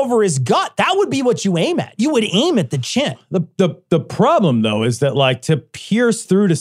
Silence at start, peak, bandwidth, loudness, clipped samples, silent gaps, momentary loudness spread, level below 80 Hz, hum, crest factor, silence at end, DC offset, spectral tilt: 0 s; -2 dBFS; 14 kHz; -17 LUFS; under 0.1%; none; 5 LU; -60 dBFS; none; 14 dB; 0 s; under 0.1%; -5.5 dB/octave